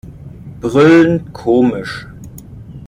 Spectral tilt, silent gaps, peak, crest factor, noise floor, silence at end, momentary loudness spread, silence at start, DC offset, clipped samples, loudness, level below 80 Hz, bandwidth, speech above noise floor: -7 dB/octave; none; -2 dBFS; 14 dB; -33 dBFS; 0 s; 26 LU; 0.05 s; under 0.1%; under 0.1%; -12 LUFS; -42 dBFS; 15.5 kHz; 21 dB